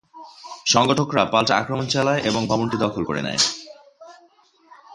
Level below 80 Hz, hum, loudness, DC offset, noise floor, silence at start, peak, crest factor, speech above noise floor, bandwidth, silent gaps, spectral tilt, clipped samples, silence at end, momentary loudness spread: -54 dBFS; none; -20 LUFS; under 0.1%; -56 dBFS; 0.15 s; -2 dBFS; 22 dB; 36 dB; 11.5 kHz; none; -3.5 dB/octave; under 0.1%; 0 s; 9 LU